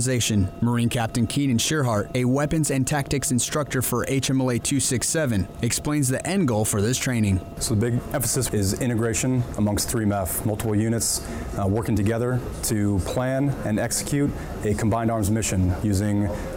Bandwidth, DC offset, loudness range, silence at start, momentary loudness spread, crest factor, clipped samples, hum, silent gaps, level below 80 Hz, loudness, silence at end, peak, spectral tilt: over 20 kHz; under 0.1%; 2 LU; 0 s; 3 LU; 10 dB; under 0.1%; none; none; -42 dBFS; -23 LUFS; 0 s; -14 dBFS; -5 dB/octave